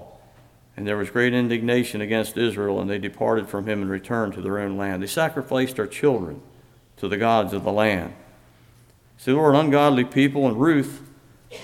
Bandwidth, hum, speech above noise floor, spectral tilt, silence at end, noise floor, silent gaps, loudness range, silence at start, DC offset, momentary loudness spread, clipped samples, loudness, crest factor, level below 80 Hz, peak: 16.5 kHz; none; 32 dB; -6 dB/octave; 0 s; -54 dBFS; none; 4 LU; 0 s; under 0.1%; 11 LU; under 0.1%; -22 LUFS; 20 dB; -58 dBFS; -4 dBFS